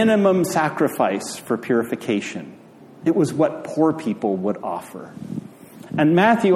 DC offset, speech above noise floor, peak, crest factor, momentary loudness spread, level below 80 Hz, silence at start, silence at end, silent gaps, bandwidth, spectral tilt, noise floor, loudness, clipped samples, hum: under 0.1%; 21 dB; -2 dBFS; 18 dB; 17 LU; -66 dBFS; 0 s; 0 s; none; 15.5 kHz; -6 dB/octave; -41 dBFS; -21 LUFS; under 0.1%; none